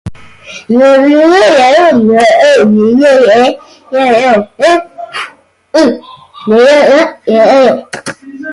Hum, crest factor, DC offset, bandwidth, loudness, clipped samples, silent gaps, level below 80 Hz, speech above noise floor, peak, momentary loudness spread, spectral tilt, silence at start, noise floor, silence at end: none; 8 dB; under 0.1%; 11.5 kHz; -7 LUFS; under 0.1%; none; -46 dBFS; 24 dB; 0 dBFS; 17 LU; -5 dB/octave; 0.05 s; -30 dBFS; 0 s